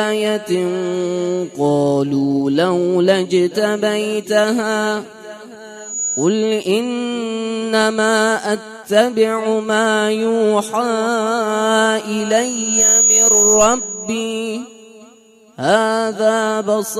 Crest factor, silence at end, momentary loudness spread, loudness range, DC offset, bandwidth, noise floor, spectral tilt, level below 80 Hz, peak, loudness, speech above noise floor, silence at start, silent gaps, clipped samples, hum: 16 dB; 0 s; 11 LU; 6 LU; under 0.1%; 15.5 kHz; -47 dBFS; -3 dB/octave; -54 dBFS; -2 dBFS; -16 LUFS; 31 dB; 0 s; none; under 0.1%; none